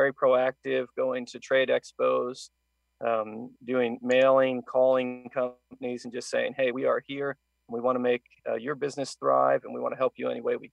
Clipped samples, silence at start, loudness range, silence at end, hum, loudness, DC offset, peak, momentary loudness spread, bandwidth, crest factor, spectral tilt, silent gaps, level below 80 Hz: under 0.1%; 0 s; 4 LU; 0.05 s; none; -28 LUFS; under 0.1%; -10 dBFS; 12 LU; 10.5 kHz; 16 dB; -5 dB/octave; none; -76 dBFS